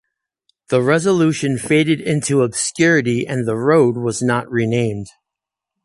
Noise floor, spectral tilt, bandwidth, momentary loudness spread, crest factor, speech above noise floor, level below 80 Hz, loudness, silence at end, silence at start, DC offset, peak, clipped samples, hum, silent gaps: -84 dBFS; -5.5 dB/octave; 11.5 kHz; 6 LU; 14 dB; 68 dB; -54 dBFS; -17 LUFS; 0.75 s; 0.7 s; under 0.1%; -2 dBFS; under 0.1%; none; none